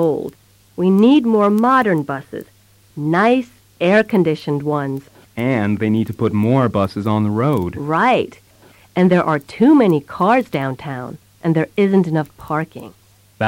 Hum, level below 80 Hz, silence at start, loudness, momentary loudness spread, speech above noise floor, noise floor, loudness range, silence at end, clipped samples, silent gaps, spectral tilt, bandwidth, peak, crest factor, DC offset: none; -54 dBFS; 0 s; -17 LUFS; 15 LU; 32 dB; -48 dBFS; 3 LU; 0 s; under 0.1%; none; -8 dB/octave; 16.5 kHz; -4 dBFS; 14 dB; under 0.1%